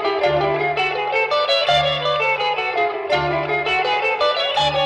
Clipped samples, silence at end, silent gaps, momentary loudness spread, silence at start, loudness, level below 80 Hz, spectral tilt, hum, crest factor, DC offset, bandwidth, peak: under 0.1%; 0 s; none; 3 LU; 0 s; -18 LUFS; -48 dBFS; -4 dB/octave; none; 12 dB; under 0.1%; 10.5 kHz; -6 dBFS